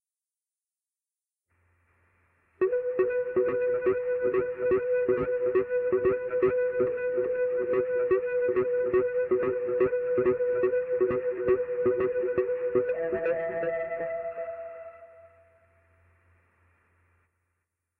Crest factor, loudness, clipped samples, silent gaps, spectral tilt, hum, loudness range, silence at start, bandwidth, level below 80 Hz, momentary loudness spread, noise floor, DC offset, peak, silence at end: 14 dB; -27 LUFS; under 0.1%; none; -10.5 dB/octave; none; 8 LU; 2.6 s; 3.2 kHz; -62 dBFS; 5 LU; under -90 dBFS; under 0.1%; -14 dBFS; 2.75 s